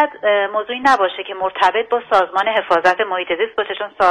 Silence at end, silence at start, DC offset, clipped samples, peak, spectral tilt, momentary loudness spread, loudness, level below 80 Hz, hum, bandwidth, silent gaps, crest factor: 0 s; 0 s; under 0.1%; under 0.1%; -2 dBFS; -3 dB/octave; 6 LU; -17 LUFS; -58 dBFS; none; 11.5 kHz; none; 16 dB